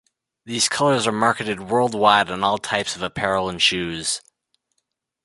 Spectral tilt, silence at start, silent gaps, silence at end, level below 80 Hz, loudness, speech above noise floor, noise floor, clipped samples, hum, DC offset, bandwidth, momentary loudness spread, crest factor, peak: -3 dB/octave; 0.45 s; none; 1.05 s; -54 dBFS; -20 LUFS; 55 dB; -76 dBFS; under 0.1%; none; under 0.1%; 11.5 kHz; 9 LU; 20 dB; -2 dBFS